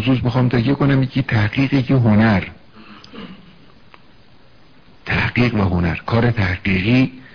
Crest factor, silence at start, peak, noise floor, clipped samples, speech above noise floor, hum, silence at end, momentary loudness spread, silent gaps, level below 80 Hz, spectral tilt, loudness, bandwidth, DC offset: 14 dB; 0 s; -4 dBFS; -50 dBFS; under 0.1%; 34 dB; none; 0.15 s; 21 LU; none; -40 dBFS; -8.5 dB/octave; -17 LUFS; 5.4 kHz; 0.5%